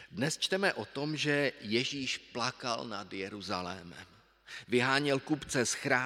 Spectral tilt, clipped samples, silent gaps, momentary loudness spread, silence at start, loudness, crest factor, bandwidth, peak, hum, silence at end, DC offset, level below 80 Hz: -3.5 dB/octave; under 0.1%; none; 12 LU; 0 s; -33 LUFS; 22 dB; 16 kHz; -10 dBFS; none; 0 s; under 0.1%; -70 dBFS